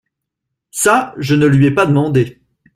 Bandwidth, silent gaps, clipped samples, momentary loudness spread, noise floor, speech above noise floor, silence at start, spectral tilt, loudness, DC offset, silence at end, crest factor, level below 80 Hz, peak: 15.5 kHz; none; under 0.1%; 7 LU; -78 dBFS; 65 dB; 0.75 s; -6 dB/octave; -13 LUFS; under 0.1%; 0.45 s; 14 dB; -48 dBFS; 0 dBFS